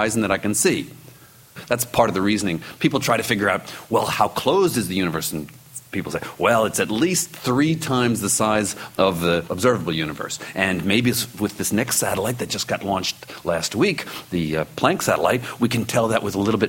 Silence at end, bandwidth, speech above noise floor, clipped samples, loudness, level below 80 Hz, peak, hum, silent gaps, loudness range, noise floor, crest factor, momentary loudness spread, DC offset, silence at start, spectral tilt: 0 s; 16.5 kHz; 26 dB; under 0.1%; -21 LUFS; -52 dBFS; -2 dBFS; none; none; 2 LU; -47 dBFS; 20 dB; 8 LU; under 0.1%; 0 s; -4 dB/octave